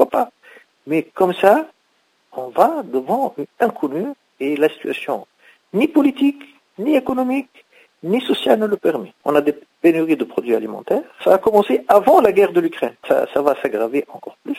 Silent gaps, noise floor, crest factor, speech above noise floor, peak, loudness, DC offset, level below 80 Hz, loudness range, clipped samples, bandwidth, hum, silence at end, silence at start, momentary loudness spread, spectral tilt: none; -63 dBFS; 18 dB; 45 dB; 0 dBFS; -18 LUFS; under 0.1%; -62 dBFS; 5 LU; under 0.1%; 16 kHz; none; 0 s; 0 s; 12 LU; -6 dB/octave